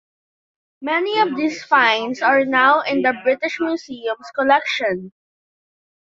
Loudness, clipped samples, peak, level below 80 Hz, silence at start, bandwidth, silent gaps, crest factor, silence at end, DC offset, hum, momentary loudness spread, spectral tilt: -18 LUFS; under 0.1%; -2 dBFS; -66 dBFS; 0.8 s; 7.6 kHz; none; 18 dB; 1 s; under 0.1%; none; 11 LU; -4 dB/octave